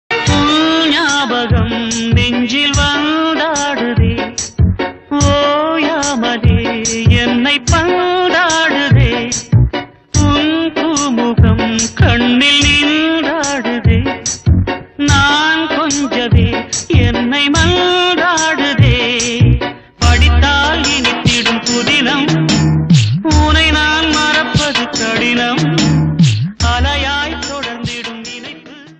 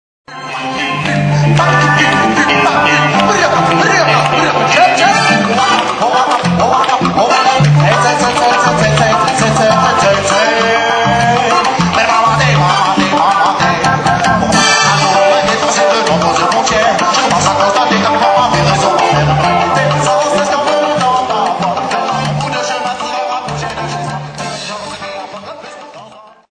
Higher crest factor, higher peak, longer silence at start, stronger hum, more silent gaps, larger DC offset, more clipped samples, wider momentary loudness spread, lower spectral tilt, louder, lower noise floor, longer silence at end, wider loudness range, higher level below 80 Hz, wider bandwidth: about the same, 12 dB vs 12 dB; about the same, 0 dBFS vs 0 dBFS; second, 0.1 s vs 0.3 s; neither; neither; neither; neither; second, 6 LU vs 10 LU; about the same, -4.5 dB/octave vs -4 dB/octave; about the same, -12 LUFS vs -10 LUFS; about the same, -33 dBFS vs -36 dBFS; second, 0.05 s vs 0.35 s; second, 3 LU vs 6 LU; first, -22 dBFS vs -38 dBFS; second, 9.4 kHz vs 10.5 kHz